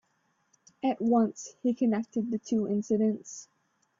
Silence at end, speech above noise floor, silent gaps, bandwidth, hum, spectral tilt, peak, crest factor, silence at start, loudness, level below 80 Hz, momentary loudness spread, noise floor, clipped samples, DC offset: 0.55 s; 45 dB; none; 7.6 kHz; none; -6.5 dB/octave; -14 dBFS; 16 dB; 0.85 s; -29 LUFS; -74 dBFS; 8 LU; -73 dBFS; under 0.1%; under 0.1%